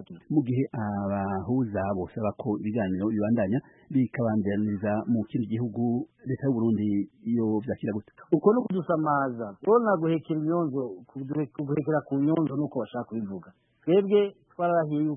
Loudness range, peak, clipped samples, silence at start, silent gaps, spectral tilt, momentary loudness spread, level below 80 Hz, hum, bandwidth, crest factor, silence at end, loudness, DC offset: 3 LU; -8 dBFS; under 0.1%; 0 s; none; -12.5 dB/octave; 9 LU; -64 dBFS; none; 3.7 kHz; 18 dB; 0 s; -27 LUFS; under 0.1%